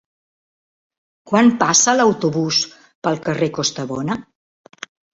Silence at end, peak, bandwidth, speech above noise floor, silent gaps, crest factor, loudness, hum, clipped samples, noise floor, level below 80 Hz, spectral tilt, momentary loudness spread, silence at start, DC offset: 0.9 s; -2 dBFS; 8 kHz; over 73 dB; 2.95-3.02 s; 18 dB; -17 LUFS; none; under 0.1%; under -90 dBFS; -58 dBFS; -3.5 dB/octave; 15 LU; 1.25 s; under 0.1%